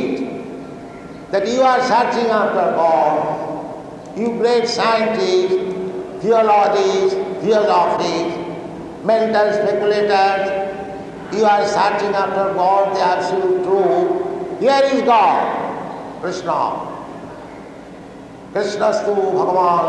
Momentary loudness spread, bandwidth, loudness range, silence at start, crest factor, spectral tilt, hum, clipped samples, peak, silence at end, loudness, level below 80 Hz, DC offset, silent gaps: 17 LU; 10 kHz; 4 LU; 0 s; 16 dB; -5 dB/octave; none; under 0.1%; -2 dBFS; 0 s; -17 LUFS; -56 dBFS; under 0.1%; none